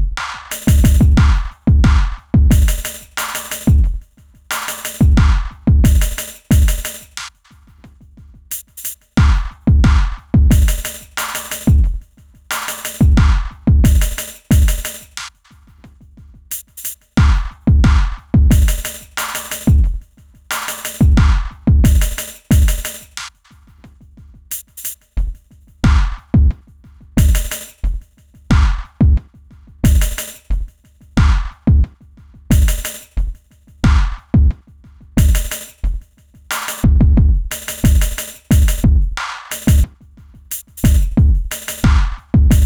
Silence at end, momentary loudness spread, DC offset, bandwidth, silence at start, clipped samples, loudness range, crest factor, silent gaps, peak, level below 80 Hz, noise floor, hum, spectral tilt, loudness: 0 s; 14 LU; under 0.1%; over 20 kHz; 0 s; under 0.1%; 4 LU; 14 dB; none; 0 dBFS; -16 dBFS; -46 dBFS; none; -5.5 dB/octave; -16 LUFS